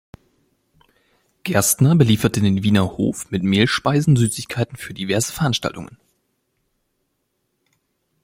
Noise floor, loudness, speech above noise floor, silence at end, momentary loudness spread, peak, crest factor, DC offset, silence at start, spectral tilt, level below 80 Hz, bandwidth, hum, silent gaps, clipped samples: -72 dBFS; -18 LUFS; 54 dB; 2.4 s; 12 LU; -2 dBFS; 18 dB; under 0.1%; 1.45 s; -5 dB/octave; -50 dBFS; 16.5 kHz; none; none; under 0.1%